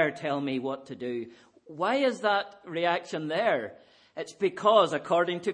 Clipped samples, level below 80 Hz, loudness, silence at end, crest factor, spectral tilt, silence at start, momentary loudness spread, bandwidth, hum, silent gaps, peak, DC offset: under 0.1%; -80 dBFS; -28 LUFS; 0 s; 20 dB; -5 dB/octave; 0 s; 17 LU; 10 kHz; none; none; -8 dBFS; under 0.1%